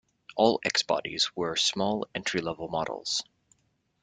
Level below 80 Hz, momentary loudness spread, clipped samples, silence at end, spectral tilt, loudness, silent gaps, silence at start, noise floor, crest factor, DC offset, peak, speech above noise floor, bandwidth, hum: -64 dBFS; 7 LU; under 0.1%; 0.8 s; -2.5 dB/octave; -28 LUFS; none; 0.3 s; -72 dBFS; 22 dB; under 0.1%; -8 dBFS; 44 dB; 9.6 kHz; none